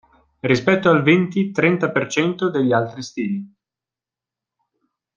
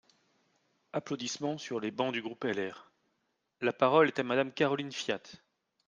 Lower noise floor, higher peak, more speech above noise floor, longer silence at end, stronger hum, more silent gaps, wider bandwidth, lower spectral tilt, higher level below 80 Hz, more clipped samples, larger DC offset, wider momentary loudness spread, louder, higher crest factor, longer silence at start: first, -89 dBFS vs -80 dBFS; first, -2 dBFS vs -12 dBFS; first, 71 dB vs 48 dB; first, 1.7 s vs 0.5 s; neither; neither; about the same, 9 kHz vs 9.6 kHz; first, -6 dB/octave vs -4.5 dB/octave; first, -60 dBFS vs -80 dBFS; neither; neither; about the same, 12 LU vs 11 LU; first, -19 LUFS vs -32 LUFS; about the same, 18 dB vs 22 dB; second, 0.45 s vs 0.95 s